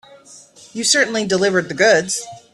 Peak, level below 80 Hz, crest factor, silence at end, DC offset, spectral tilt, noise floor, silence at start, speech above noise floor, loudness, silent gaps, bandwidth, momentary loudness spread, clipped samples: 0 dBFS; -60 dBFS; 18 dB; 0.15 s; under 0.1%; -2.5 dB/octave; -44 dBFS; 0.3 s; 27 dB; -16 LUFS; none; 13.5 kHz; 10 LU; under 0.1%